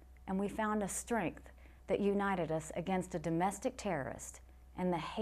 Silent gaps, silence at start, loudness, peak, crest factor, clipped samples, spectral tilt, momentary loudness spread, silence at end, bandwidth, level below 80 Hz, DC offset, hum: none; 0 s; -37 LUFS; -22 dBFS; 16 dB; under 0.1%; -5.5 dB/octave; 11 LU; 0 s; 14.5 kHz; -58 dBFS; under 0.1%; none